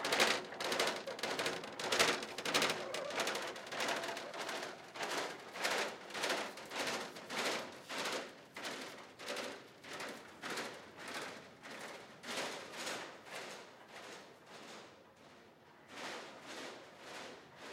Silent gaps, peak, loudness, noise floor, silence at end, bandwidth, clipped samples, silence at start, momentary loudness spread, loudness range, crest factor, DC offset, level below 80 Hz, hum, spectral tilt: none; -18 dBFS; -40 LUFS; -61 dBFS; 0 s; 16.5 kHz; under 0.1%; 0 s; 18 LU; 14 LU; 24 dB; under 0.1%; -84 dBFS; none; -1.5 dB/octave